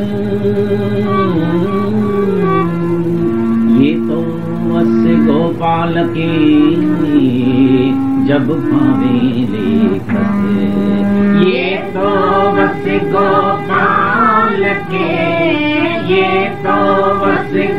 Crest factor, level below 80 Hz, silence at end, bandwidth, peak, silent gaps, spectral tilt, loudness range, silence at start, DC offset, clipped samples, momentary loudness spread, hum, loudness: 12 dB; -44 dBFS; 0 s; 6 kHz; 0 dBFS; none; -8.5 dB/octave; 2 LU; 0 s; 3%; under 0.1%; 5 LU; none; -13 LUFS